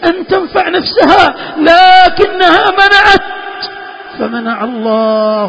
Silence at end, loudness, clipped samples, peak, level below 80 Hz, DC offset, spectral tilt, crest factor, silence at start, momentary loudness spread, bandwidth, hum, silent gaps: 0 s; -8 LUFS; 2%; 0 dBFS; -38 dBFS; under 0.1%; -4.5 dB/octave; 8 dB; 0 s; 17 LU; 8 kHz; none; none